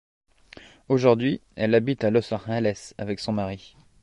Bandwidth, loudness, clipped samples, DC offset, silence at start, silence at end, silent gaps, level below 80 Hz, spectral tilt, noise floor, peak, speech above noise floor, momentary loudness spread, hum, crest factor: 11 kHz; -24 LUFS; under 0.1%; under 0.1%; 0.9 s; 0.45 s; none; -56 dBFS; -7 dB/octave; -49 dBFS; -4 dBFS; 26 dB; 12 LU; none; 20 dB